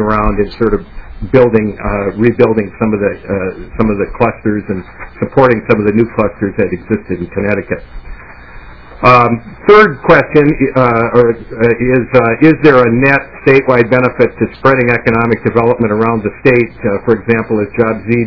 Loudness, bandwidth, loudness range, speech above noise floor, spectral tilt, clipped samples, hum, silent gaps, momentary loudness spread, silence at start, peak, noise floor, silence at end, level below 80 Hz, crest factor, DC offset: -11 LUFS; 5.4 kHz; 5 LU; 22 dB; -9 dB/octave; 2%; none; none; 10 LU; 0 s; 0 dBFS; -32 dBFS; 0 s; -30 dBFS; 12 dB; 1%